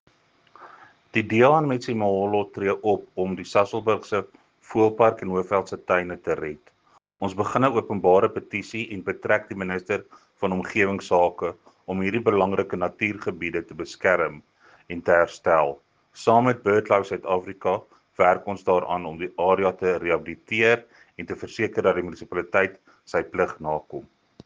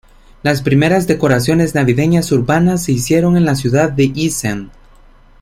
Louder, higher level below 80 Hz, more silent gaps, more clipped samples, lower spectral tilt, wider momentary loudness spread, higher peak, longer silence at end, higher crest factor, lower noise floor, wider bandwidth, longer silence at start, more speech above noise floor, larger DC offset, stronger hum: second, -24 LUFS vs -14 LUFS; second, -60 dBFS vs -38 dBFS; neither; neither; about the same, -6.5 dB/octave vs -6 dB/octave; first, 11 LU vs 5 LU; second, -4 dBFS vs 0 dBFS; second, 0.45 s vs 0.7 s; first, 20 dB vs 14 dB; first, -57 dBFS vs -43 dBFS; second, 9.4 kHz vs 16 kHz; first, 0.6 s vs 0.45 s; first, 34 dB vs 30 dB; neither; neither